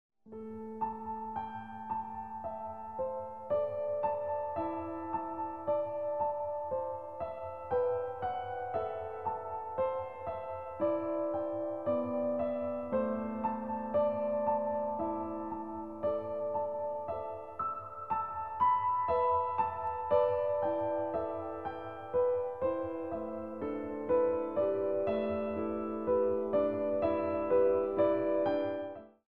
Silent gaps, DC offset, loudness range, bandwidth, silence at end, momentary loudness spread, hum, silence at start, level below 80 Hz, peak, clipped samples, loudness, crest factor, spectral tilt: none; 0.1%; 5 LU; 4.8 kHz; 0.05 s; 11 LU; none; 0.1 s; -64 dBFS; -16 dBFS; under 0.1%; -34 LUFS; 18 dB; -9 dB/octave